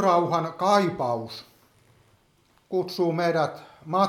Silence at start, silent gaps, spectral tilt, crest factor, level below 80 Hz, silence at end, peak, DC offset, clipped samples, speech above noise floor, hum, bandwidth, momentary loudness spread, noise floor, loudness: 0 s; none; -6 dB/octave; 18 dB; -68 dBFS; 0 s; -8 dBFS; under 0.1%; under 0.1%; 39 dB; none; 15.5 kHz; 13 LU; -63 dBFS; -25 LUFS